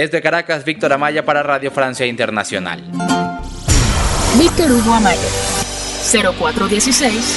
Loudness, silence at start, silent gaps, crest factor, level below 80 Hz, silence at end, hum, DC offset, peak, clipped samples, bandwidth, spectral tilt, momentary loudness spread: -15 LUFS; 0 s; none; 16 dB; -26 dBFS; 0 s; none; under 0.1%; 0 dBFS; under 0.1%; 12 kHz; -3.5 dB/octave; 8 LU